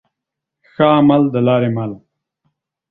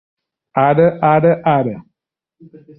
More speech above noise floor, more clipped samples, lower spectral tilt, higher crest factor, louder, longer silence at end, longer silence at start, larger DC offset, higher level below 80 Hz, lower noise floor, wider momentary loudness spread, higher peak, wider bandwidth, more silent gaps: first, 68 dB vs 64 dB; neither; second, -10.5 dB/octave vs -12 dB/octave; about the same, 16 dB vs 14 dB; about the same, -14 LUFS vs -14 LUFS; about the same, 0.95 s vs 1 s; first, 0.8 s vs 0.55 s; neither; about the same, -56 dBFS vs -54 dBFS; about the same, -81 dBFS vs -78 dBFS; about the same, 11 LU vs 11 LU; about the same, 0 dBFS vs -2 dBFS; about the same, 4.1 kHz vs 4.2 kHz; neither